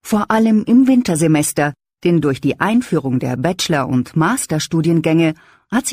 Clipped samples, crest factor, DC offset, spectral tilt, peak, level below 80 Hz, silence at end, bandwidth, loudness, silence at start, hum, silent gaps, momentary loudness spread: under 0.1%; 14 dB; under 0.1%; -5.5 dB/octave; -2 dBFS; -52 dBFS; 0 s; 16 kHz; -16 LUFS; 0.05 s; none; none; 7 LU